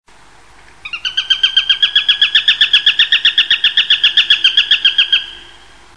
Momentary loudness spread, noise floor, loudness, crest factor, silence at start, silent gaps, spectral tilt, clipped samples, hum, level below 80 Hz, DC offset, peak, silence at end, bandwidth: 7 LU; -44 dBFS; -9 LUFS; 14 dB; 0.85 s; none; 2 dB/octave; under 0.1%; none; -52 dBFS; 0.6%; 0 dBFS; 0.55 s; 10.5 kHz